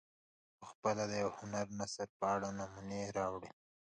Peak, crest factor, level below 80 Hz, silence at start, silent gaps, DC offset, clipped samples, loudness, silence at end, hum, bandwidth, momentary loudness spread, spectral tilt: -22 dBFS; 20 dB; -70 dBFS; 0.6 s; 0.75-0.83 s, 2.09-2.20 s; under 0.1%; under 0.1%; -40 LUFS; 0.5 s; none; 9.8 kHz; 12 LU; -4.5 dB/octave